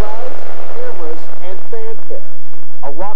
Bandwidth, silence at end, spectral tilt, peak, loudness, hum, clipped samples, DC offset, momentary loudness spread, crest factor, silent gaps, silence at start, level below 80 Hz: 16.5 kHz; 0 s; -7.5 dB/octave; 0 dBFS; -30 LUFS; none; under 0.1%; 90%; 9 LU; 16 dB; none; 0 s; -58 dBFS